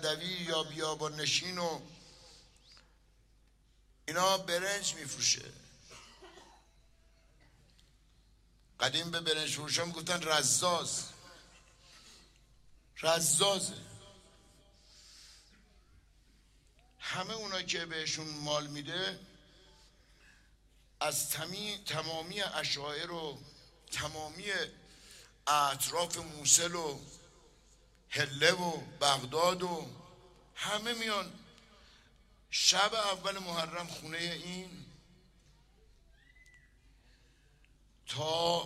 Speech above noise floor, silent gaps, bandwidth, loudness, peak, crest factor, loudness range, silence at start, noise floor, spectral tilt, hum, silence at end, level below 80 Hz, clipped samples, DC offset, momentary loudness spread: 32 dB; none; 16 kHz; -33 LUFS; -10 dBFS; 28 dB; 8 LU; 0 s; -66 dBFS; -1.5 dB/octave; none; 0 s; -66 dBFS; under 0.1%; under 0.1%; 25 LU